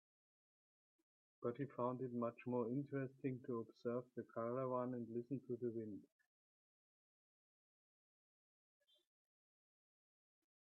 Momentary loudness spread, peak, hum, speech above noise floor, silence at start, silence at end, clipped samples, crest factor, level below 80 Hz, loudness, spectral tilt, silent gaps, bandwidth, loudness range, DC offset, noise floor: 6 LU; -30 dBFS; none; over 44 dB; 1.4 s; 4.7 s; under 0.1%; 20 dB; under -90 dBFS; -46 LUFS; -9 dB/octave; none; 4.2 kHz; 8 LU; under 0.1%; under -90 dBFS